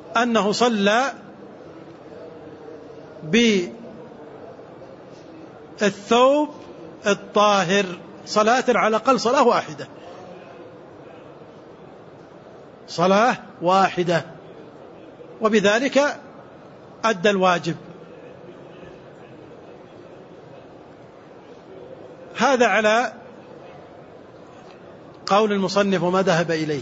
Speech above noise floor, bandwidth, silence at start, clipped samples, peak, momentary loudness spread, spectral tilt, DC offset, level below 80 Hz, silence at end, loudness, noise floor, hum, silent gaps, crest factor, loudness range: 25 dB; 8 kHz; 0 s; under 0.1%; -4 dBFS; 25 LU; -4.5 dB/octave; under 0.1%; -66 dBFS; 0 s; -19 LUFS; -44 dBFS; none; none; 18 dB; 14 LU